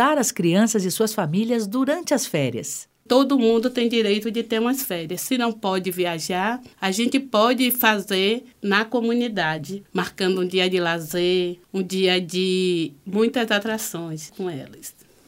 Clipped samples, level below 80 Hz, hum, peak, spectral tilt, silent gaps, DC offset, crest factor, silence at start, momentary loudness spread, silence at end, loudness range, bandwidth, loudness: under 0.1%; -66 dBFS; none; -2 dBFS; -4 dB/octave; none; under 0.1%; 20 dB; 0 s; 10 LU; 0.35 s; 2 LU; 16.5 kHz; -22 LUFS